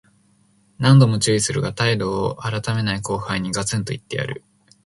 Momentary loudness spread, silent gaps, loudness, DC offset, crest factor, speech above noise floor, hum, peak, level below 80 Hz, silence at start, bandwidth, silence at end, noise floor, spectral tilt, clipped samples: 13 LU; none; -20 LUFS; under 0.1%; 18 dB; 39 dB; none; -2 dBFS; -50 dBFS; 0.8 s; 11.5 kHz; 0.5 s; -59 dBFS; -5 dB/octave; under 0.1%